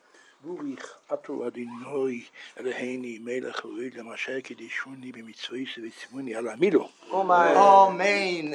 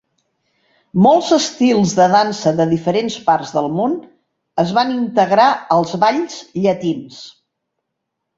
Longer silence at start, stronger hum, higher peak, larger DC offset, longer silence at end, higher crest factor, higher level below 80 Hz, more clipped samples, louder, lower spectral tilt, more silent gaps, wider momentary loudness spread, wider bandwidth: second, 0.45 s vs 0.95 s; neither; second, -4 dBFS vs 0 dBFS; neither; second, 0 s vs 1.1 s; first, 22 dB vs 16 dB; second, -86 dBFS vs -58 dBFS; neither; second, -25 LUFS vs -16 LUFS; about the same, -4.5 dB/octave vs -5.5 dB/octave; neither; first, 21 LU vs 11 LU; first, 11 kHz vs 8 kHz